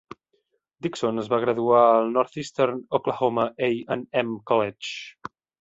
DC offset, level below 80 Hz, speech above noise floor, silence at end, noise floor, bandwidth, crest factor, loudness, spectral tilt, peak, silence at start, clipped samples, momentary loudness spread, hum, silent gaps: under 0.1%; -66 dBFS; 48 dB; 0.5 s; -72 dBFS; 8 kHz; 20 dB; -24 LUFS; -5.5 dB/octave; -6 dBFS; 0.85 s; under 0.1%; 15 LU; none; none